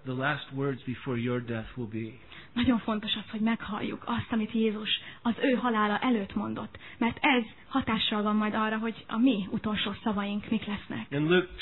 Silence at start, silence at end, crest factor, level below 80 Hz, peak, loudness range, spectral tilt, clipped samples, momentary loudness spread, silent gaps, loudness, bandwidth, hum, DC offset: 0.05 s; 0 s; 18 dB; -56 dBFS; -12 dBFS; 3 LU; -9 dB/octave; under 0.1%; 10 LU; none; -30 LUFS; 4.2 kHz; none; 0.2%